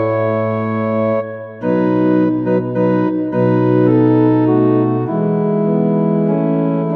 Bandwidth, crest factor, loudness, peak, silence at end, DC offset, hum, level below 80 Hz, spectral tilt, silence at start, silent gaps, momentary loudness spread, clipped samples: 4.3 kHz; 12 dB; -15 LUFS; -2 dBFS; 0 s; under 0.1%; none; -52 dBFS; -11.5 dB/octave; 0 s; none; 6 LU; under 0.1%